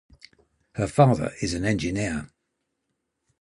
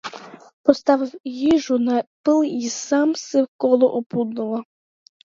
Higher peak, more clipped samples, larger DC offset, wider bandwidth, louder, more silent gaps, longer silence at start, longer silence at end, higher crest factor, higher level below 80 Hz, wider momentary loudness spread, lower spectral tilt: second, -4 dBFS vs 0 dBFS; neither; neither; first, 11.5 kHz vs 7.6 kHz; second, -24 LUFS vs -20 LUFS; second, none vs 0.53-0.64 s, 1.20-1.24 s, 2.07-2.24 s, 3.48-3.59 s, 4.06-4.10 s; first, 0.75 s vs 0.05 s; first, 1.15 s vs 0.6 s; about the same, 22 dB vs 20 dB; first, -46 dBFS vs -62 dBFS; about the same, 12 LU vs 10 LU; first, -6 dB/octave vs -4.5 dB/octave